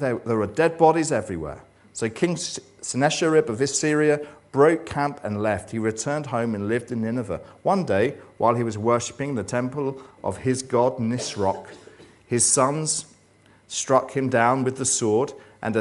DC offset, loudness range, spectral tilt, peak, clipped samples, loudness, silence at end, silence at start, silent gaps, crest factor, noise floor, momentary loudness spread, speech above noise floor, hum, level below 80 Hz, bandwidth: under 0.1%; 3 LU; -4.5 dB/octave; -4 dBFS; under 0.1%; -23 LUFS; 0 s; 0 s; none; 20 dB; -56 dBFS; 11 LU; 33 dB; none; -58 dBFS; 11.5 kHz